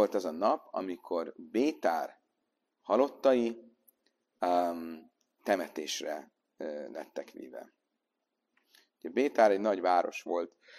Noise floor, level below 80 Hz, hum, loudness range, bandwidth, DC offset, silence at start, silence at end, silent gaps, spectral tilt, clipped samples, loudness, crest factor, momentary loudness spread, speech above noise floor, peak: -85 dBFS; -82 dBFS; none; 7 LU; 14.5 kHz; under 0.1%; 0 s; 0 s; none; -4 dB/octave; under 0.1%; -31 LUFS; 22 dB; 18 LU; 54 dB; -10 dBFS